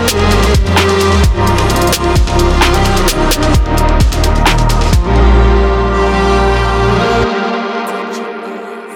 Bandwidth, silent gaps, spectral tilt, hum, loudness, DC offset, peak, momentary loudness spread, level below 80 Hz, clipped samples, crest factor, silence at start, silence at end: 17.5 kHz; none; -5 dB/octave; none; -11 LUFS; under 0.1%; 0 dBFS; 8 LU; -14 dBFS; under 0.1%; 10 dB; 0 s; 0 s